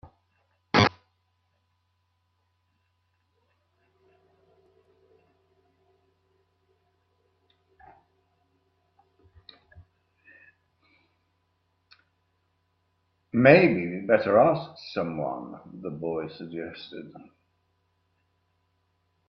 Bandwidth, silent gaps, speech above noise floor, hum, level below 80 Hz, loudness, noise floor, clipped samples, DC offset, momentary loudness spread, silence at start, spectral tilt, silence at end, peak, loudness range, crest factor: 6.4 kHz; none; 50 dB; none; -68 dBFS; -24 LUFS; -74 dBFS; under 0.1%; under 0.1%; 22 LU; 0.75 s; -6.5 dB/octave; 2.1 s; -4 dBFS; 16 LU; 28 dB